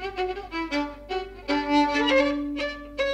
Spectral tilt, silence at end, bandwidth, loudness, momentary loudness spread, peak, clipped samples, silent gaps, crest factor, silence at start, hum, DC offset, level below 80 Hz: -4 dB/octave; 0 s; 9.2 kHz; -26 LUFS; 11 LU; -10 dBFS; under 0.1%; none; 16 dB; 0 s; none; under 0.1%; -46 dBFS